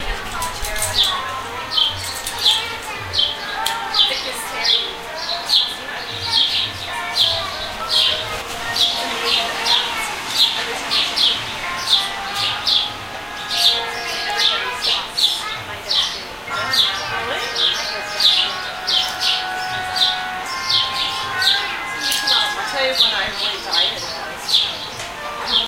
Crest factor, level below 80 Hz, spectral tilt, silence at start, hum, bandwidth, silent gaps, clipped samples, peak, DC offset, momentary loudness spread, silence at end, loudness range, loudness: 20 dB; -44 dBFS; -0.5 dB/octave; 0 s; none; 16 kHz; none; under 0.1%; 0 dBFS; under 0.1%; 10 LU; 0 s; 1 LU; -18 LUFS